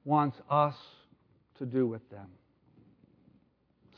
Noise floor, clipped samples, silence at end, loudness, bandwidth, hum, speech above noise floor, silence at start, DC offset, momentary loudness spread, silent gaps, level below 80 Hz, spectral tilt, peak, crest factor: -69 dBFS; under 0.1%; 1.7 s; -31 LUFS; 5.4 kHz; none; 38 dB; 0.05 s; under 0.1%; 22 LU; none; -78 dBFS; -10 dB/octave; -14 dBFS; 22 dB